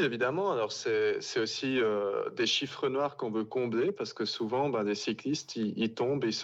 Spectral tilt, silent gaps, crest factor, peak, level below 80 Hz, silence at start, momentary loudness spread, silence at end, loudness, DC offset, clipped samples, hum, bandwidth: -4.5 dB/octave; none; 14 dB; -18 dBFS; -78 dBFS; 0 s; 5 LU; 0 s; -31 LUFS; under 0.1%; under 0.1%; none; 8 kHz